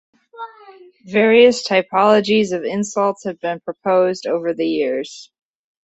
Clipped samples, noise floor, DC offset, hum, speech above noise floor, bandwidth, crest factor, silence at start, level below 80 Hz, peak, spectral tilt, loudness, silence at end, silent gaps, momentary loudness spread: under 0.1%; -36 dBFS; under 0.1%; none; 19 dB; 8.2 kHz; 16 dB; 0.35 s; -64 dBFS; -2 dBFS; -4.5 dB/octave; -17 LUFS; 0.6 s; none; 21 LU